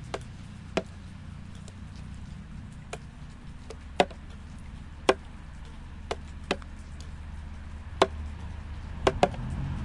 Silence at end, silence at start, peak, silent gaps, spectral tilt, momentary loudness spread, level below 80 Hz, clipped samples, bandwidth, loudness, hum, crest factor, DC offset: 0 s; 0 s; -4 dBFS; none; -5 dB/octave; 17 LU; -44 dBFS; under 0.1%; 11.5 kHz; -33 LUFS; none; 30 dB; under 0.1%